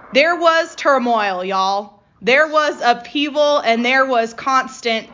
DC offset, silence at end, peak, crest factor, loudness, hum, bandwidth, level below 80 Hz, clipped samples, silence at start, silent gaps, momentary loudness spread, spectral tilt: under 0.1%; 0.05 s; -2 dBFS; 16 dB; -16 LUFS; none; 7.6 kHz; -62 dBFS; under 0.1%; 0.05 s; none; 7 LU; -3 dB/octave